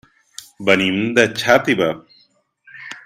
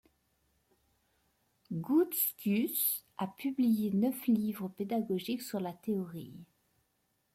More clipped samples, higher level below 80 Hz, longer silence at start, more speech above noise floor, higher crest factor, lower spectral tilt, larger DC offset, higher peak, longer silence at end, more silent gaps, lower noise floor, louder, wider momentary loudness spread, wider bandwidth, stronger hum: neither; first, -58 dBFS vs -76 dBFS; second, 0.6 s vs 1.7 s; about the same, 42 dB vs 45 dB; about the same, 20 dB vs 16 dB; about the same, -4.5 dB/octave vs -5.5 dB/octave; neither; first, 0 dBFS vs -18 dBFS; second, 0.05 s vs 0.9 s; neither; second, -58 dBFS vs -78 dBFS; first, -16 LUFS vs -33 LUFS; first, 23 LU vs 11 LU; about the same, 16 kHz vs 16.5 kHz; neither